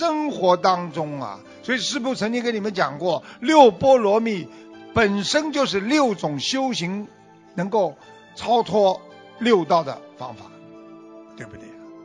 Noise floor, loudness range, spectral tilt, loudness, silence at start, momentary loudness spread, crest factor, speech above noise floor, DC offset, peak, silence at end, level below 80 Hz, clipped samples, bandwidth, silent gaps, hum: -43 dBFS; 5 LU; -4.5 dB/octave; -21 LUFS; 0 s; 19 LU; 20 dB; 22 dB; under 0.1%; -2 dBFS; 0 s; -58 dBFS; under 0.1%; 10.5 kHz; none; none